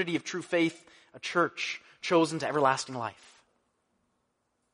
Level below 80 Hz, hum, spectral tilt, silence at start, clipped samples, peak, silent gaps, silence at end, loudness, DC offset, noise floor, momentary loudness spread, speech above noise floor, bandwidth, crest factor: -78 dBFS; none; -4.5 dB/octave; 0 s; under 0.1%; -10 dBFS; none; 1.6 s; -30 LUFS; under 0.1%; -77 dBFS; 11 LU; 48 dB; 10.5 kHz; 22 dB